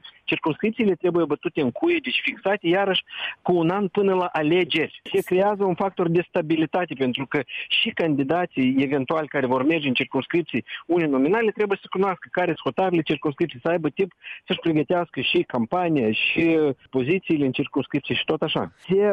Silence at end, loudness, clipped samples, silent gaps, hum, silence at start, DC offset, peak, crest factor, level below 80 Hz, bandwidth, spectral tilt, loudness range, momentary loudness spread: 0 s; -23 LUFS; under 0.1%; none; none; 0.05 s; under 0.1%; -10 dBFS; 14 dB; -62 dBFS; 13 kHz; -7 dB/octave; 2 LU; 5 LU